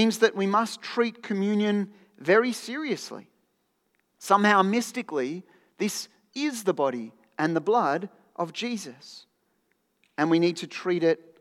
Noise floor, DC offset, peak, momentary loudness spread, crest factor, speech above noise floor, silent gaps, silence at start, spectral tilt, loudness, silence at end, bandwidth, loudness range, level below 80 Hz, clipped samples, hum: -73 dBFS; under 0.1%; -6 dBFS; 17 LU; 22 dB; 48 dB; none; 0 s; -5 dB/octave; -26 LUFS; 0.25 s; 15.5 kHz; 4 LU; -90 dBFS; under 0.1%; none